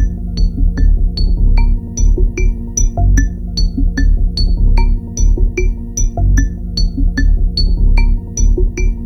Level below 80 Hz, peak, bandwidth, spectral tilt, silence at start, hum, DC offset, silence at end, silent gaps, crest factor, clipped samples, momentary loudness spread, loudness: -12 dBFS; 0 dBFS; 6.4 kHz; -4.5 dB/octave; 0 s; none; under 0.1%; 0 s; none; 12 dB; under 0.1%; 4 LU; -16 LUFS